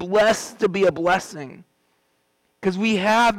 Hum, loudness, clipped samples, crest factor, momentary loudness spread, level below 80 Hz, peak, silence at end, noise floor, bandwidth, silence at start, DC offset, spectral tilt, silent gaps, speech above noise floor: none; -20 LUFS; under 0.1%; 12 dB; 16 LU; -56 dBFS; -10 dBFS; 0 s; -68 dBFS; 17 kHz; 0 s; under 0.1%; -4.5 dB/octave; none; 47 dB